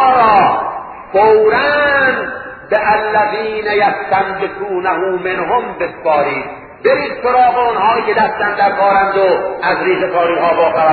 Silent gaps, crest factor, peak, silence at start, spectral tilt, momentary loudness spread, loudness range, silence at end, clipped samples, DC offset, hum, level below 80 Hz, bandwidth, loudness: none; 12 dB; 0 dBFS; 0 s; -8.5 dB/octave; 8 LU; 3 LU; 0 s; under 0.1%; under 0.1%; none; -48 dBFS; 4.9 kHz; -13 LUFS